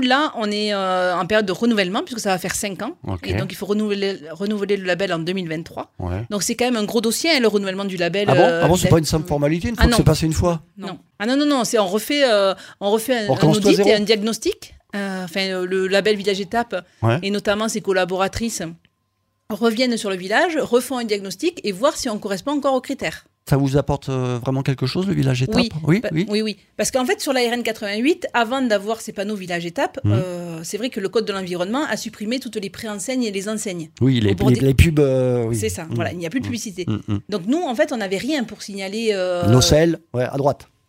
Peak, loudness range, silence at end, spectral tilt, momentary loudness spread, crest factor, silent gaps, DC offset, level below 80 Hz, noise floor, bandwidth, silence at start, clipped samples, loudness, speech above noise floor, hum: 0 dBFS; 6 LU; 0.25 s; -5 dB/octave; 11 LU; 20 dB; none; under 0.1%; -38 dBFS; -70 dBFS; 16 kHz; 0 s; under 0.1%; -20 LUFS; 50 dB; none